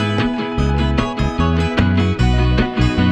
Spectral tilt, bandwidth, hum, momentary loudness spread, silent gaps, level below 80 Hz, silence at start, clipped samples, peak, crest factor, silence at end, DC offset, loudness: -7 dB/octave; 9 kHz; none; 3 LU; none; -22 dBFS; 0 s; under 0.1%; -2 dBFS; 14 dB; 0 s; under 0.1%; -17 LUFS